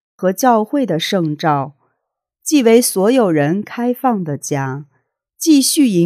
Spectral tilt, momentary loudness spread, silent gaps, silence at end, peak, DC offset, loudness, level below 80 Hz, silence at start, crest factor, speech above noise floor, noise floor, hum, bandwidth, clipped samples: -4.5 dB/octave; 10 LU; none; 0 s; 0 dBFS; under 0.1%; -15 LUFS; -74 dBFS; 0.2 s; 16 dB; 61 dB; -75 dBFS; none; 16 kHz; under 0.1%